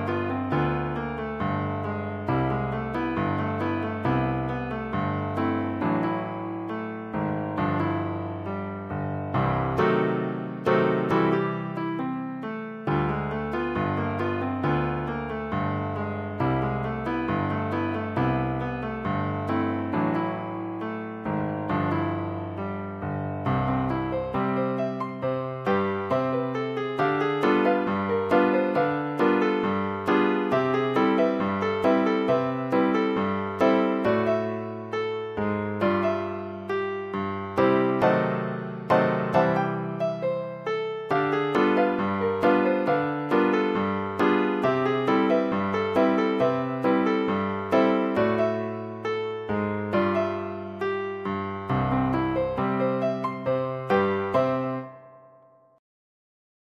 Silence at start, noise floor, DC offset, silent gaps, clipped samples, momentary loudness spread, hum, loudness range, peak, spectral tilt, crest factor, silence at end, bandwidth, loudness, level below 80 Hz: 0 s; -56 dBFS; under 0.1%; none; under 0.1%; 8 LU; none; 5 LU; -6 dBFS; -8.5 dB/octave; 18 dB; 1.55 s; 8.6 kHz; -26 LUFS; -48 dBFS